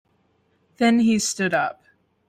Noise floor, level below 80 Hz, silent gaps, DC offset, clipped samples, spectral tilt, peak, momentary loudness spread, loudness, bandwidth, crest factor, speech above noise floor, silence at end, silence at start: -65 dBFS; -64 dBFS; none; under 0.1%; under 0.1%; -4 dB/octave; -8 dBFS; 6 LU; -21 LUFS; 15 kHz; 16 dB; 45 dB; 0.55 s; 0.8 s